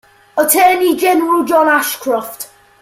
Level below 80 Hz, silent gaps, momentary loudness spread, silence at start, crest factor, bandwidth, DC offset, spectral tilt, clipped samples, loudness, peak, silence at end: -58 dBFS; none; 15 LU; 0.35 s; 14 dB; 16.5 kHz; under 0.1%; -1.5 dB/octave; under 0.1%; -13 LUFS; 0 dBFS; 0.35 s